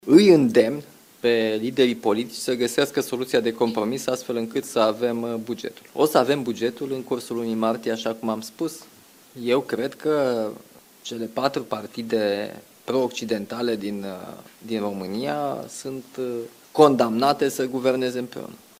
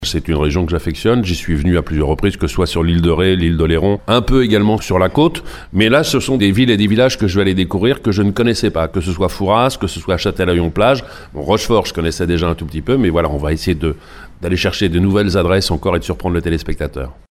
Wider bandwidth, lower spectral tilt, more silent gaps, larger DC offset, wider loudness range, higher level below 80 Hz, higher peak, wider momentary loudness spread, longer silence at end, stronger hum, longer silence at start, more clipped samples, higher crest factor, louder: about the same, 16 kHz vs 15.5 kHz; about the same, -5 dB/octave vs -6 dB/octave; neither; neither; about the same, 5 LU vs 3 LU; second, -66 dBFS vs -28 dBFS; about the same, -2 dBFS vs 0 dBFS; first, 13 LU vs 7 LU; about the same, 0.25 s vs 0.2 s; neither; about the same, 0.05 s vs 0 s; neither; first, 22 dB vs 14 dB; second, -23 LUFS vs -15 LUFS